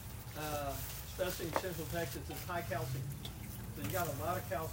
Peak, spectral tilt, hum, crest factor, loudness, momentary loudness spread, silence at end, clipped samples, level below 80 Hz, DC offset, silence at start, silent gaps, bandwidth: -16 dBFS; -4.5 dB/octave; none; 24 dB; -40 LUFS; 8 LU; 0 s; under 0.1%; -54 dBFS; under 0.1%; 0 s; none; 16.5 kHz